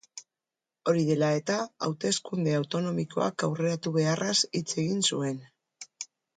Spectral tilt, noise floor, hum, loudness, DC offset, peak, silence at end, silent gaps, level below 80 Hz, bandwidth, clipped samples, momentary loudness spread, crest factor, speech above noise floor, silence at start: -4.5 dB/octave; -90 dBFS; none; -28 LUFS; under 0.1%; -12 dBFS; 0.3 s; none; -72 dBFS; 9.4 kHz; under 0.1%; 16 LU; 18 dB; 62 dB; 0.15 s